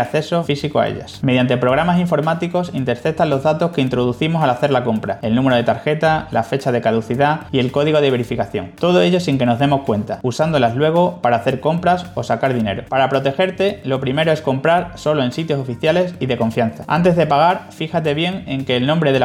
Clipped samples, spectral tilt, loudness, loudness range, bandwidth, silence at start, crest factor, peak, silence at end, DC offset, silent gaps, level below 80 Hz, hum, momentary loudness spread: under 0.1%; -7 dB/octave; -17 LUFS; 1 LU; 14 kHz; 0 s; 14 dB; -2 dBFS; 0 s; under 0.1%; none; -48 dBFS; none; 6 LU